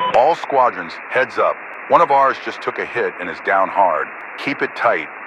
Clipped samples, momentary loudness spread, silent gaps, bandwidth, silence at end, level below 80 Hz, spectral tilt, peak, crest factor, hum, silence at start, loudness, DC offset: under 0.1%; 10 LU; none; 10 kHz; 0 s; -62 dBFS; -5 dB/octave; 0 dBFS; 18 dB; none; 0 s; -18 LUFS; under 0.1%